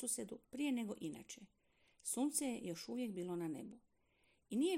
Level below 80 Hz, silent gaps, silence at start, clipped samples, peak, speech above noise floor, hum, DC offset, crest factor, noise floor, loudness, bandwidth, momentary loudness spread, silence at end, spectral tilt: -82 dBFS; none; 0 s; under 0.1%; -24 dBFS; 35 dB; none; under 0.1%; 20 dB; -77 dBFS; -43 LUFS; 16 kHz; 13 LU; 0 s; -4 dB/octave